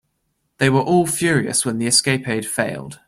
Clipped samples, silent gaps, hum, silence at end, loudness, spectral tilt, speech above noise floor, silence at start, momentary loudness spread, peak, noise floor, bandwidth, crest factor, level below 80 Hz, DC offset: under 0.1%; none; none; 0.15 s; -18 LUFS; -3.5 dB/octave; 52 dB; 0.6 s; 7 LU; -2 dBFS; -70 dBFS; 16 kHz; 18 dB; -56 dBFS; under 0.1%